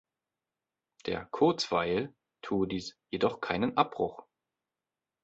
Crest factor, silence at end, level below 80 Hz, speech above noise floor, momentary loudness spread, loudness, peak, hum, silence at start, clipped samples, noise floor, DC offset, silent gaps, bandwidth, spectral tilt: 24 dB; 1 s; -62 dBFS; over 59 dB; 11 LU; -31 LUFS; -10 dBFS; none; 1.05 s; under 0.1%; under -90 dBFS; under 0.1%; none; 8.2 kHz; -5.5 dB/octave